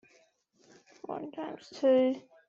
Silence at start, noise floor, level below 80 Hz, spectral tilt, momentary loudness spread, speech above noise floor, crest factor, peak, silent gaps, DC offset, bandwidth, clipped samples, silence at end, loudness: 1.1 s; -68 dBFS; -82 dBFS; -5.5 dB/octave; 16 LU; 38 dB; 16 dB; -16 dBFS; none; under 0.1%; 7.4 kHz; under 0.1%; 0.3 s; -31 LUFS